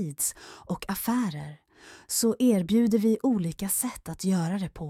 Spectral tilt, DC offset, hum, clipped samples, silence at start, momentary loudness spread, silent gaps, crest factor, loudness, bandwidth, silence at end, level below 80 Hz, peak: -5 dB/octave; under 0.1%; none; under 0.1%; 0 s; 12 LU; none; 14 dB; -27 LUFS; 16.5 kHz; 0 s; -56 dBFS; -12 dBFS